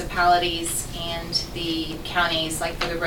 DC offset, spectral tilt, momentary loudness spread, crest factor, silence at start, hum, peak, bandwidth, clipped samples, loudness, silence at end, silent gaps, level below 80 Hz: under 0.1%; -3 dB/octave; 8 LU; 16 dB; 0 s; none; -8 dBFS; 19 kHz; under 0.1%; -24 LUFS; 0 s; none; -38 dBFS